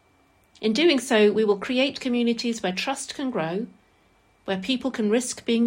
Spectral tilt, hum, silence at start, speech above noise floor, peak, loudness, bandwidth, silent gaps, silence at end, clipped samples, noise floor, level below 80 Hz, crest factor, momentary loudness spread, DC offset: -4 dB/octave; none; 0.6 s; 38 dB; -8 dBFS; -24 LUFS; 16 kHz; none; 0 s; under 0.1%; -61 dBFS; -66 dBFS; 16 dB; 10 LU; under 0.1%